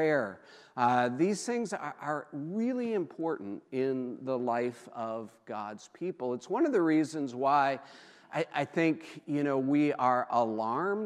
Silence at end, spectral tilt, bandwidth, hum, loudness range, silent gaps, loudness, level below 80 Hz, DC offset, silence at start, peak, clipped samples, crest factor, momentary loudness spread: 0 s; -6 dB/octave; 11.5 kHz; none; 5 LU; none; -31 LUFS; -86 dBFS; under 0.1%; 0 s; -12 dBFS; under 0.1%; 18 dB; 12 LU